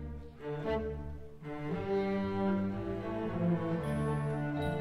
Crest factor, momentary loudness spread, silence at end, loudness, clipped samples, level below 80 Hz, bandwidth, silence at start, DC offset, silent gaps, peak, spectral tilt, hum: 14 dB; 12 LU; 0 s; -35 LUFS; under 0.1%; -50 dBFS; 13.5 kHz; 0 s; under 0.1%; none; -22 dBFS; -8.5 dB/octave; none